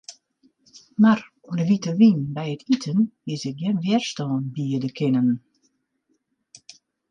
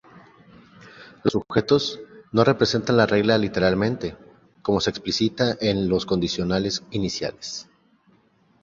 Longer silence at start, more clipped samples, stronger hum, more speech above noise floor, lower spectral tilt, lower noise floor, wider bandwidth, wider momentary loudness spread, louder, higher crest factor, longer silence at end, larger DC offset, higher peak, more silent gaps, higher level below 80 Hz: about the same, 0.1 s vs 0.15 s; neither; neither; first, 50 dB vs 39 dB; about the same, -6.5 dB/octave vs -5.5 dB/octave; first, -71 dBFS vs -60 dBFS; first, 8.8 kHz vs 7.6 kHz; about the same, 12 LU vs 11 LU; about the same, -22 LUFS vs -23 LUFS; about the same, 18 dB vs 20 dB; first, 1.7 s vs 1 s; neither; second, -6 dBFS vs -2 dBFS; neither; second, -68 dBFS vs -50 dBFS